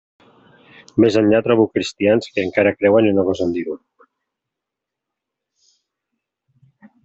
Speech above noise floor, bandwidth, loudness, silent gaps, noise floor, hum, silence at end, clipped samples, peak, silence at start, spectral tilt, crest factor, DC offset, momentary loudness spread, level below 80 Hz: 67 dB; 8 kHz; -17 LUFS; none; -83 dBFS; none; 3.3 s; under 0.1%; -2 dBFS; 0.95 s; -6.5 dB/octave; 18 dB; under 0.1%; 10 LU; -60 dBFS